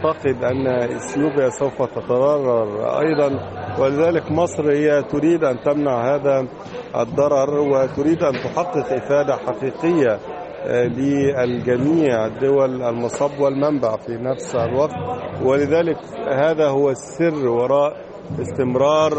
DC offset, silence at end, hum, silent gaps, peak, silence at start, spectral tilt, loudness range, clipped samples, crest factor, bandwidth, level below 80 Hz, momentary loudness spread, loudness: under 0.1%; 0 s; none; none; -4 dBFS; 0 s; -6.5 dB/octave; 2 LU; under 0.1%; 14 dB; 8.4 kHz; -54 dBFS; 7 LU; -19 LUFS